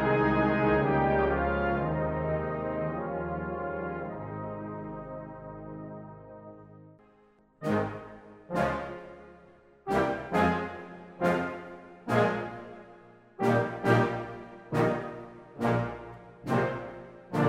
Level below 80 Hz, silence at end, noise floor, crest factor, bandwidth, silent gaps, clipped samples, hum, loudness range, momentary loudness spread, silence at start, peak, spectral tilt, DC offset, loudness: -48 dBFS; 0 s; -62 dBFS; 20 dB; 15.5 kHz; none; under 0.1%; none; 9 LU; 20 LU; 0 s; -12 dBFS; -7.5 dB/octave; under 0.1%; -30 LUFS